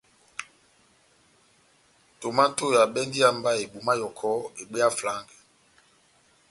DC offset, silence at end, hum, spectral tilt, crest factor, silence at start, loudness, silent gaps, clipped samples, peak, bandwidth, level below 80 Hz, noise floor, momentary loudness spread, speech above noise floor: under 0.1%; 1.3 s; none; -3 dB/octave; 22 dB; 0.4 s; -25 LUFS; none; under 0.1%; -6 dBFS; 11.5 kHz; -70 dBFS; -62 dBFS; 16 LU; 37 dB